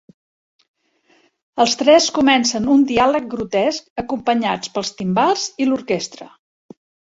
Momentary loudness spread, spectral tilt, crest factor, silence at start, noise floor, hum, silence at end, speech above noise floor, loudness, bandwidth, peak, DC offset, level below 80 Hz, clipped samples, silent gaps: 11 LU; -3.5 dB/octave; 18 dB; 1.55 s; -59 dBFS; none; 0.85 s; 42 dB; -17 LUFS; 8 kHz; -2 dBFS; under 0.1%; -54 dBFS; under 0.1%; 3.90-3.96 s